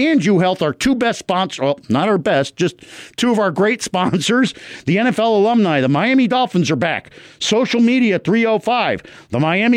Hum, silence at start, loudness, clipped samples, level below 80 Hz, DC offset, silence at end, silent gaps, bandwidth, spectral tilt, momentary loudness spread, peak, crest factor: none; 0 s; -16 LUFS; under 0.1%; -52 dBFS; under 0.1%; 0 s; none; 14.5 kHz; -5 dB/octave; 7 LU; -6 dBFS; 10 dB